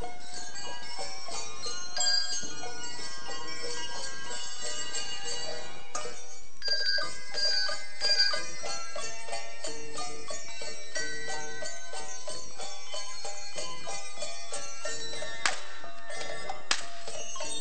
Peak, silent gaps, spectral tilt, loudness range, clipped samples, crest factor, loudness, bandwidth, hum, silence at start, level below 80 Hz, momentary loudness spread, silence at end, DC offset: -8 dBFS; none; -0.5 dB/octave; 9 LU; under 0.1%; 28 dB; -33 LUFS; 18 kHz; none; 0 s; -64 dBFS; 13 LU; 0 s; 5%